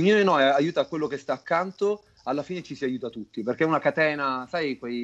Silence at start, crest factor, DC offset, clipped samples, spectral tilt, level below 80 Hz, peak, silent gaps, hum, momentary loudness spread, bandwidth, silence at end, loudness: 0 s; 14 dB; under 0.1%; under 0.1%; -6 dB/octave; -68 dBFS; -10 dBFS; none; none; 12 LU; 8 kHz; 0 s; -26 LUFS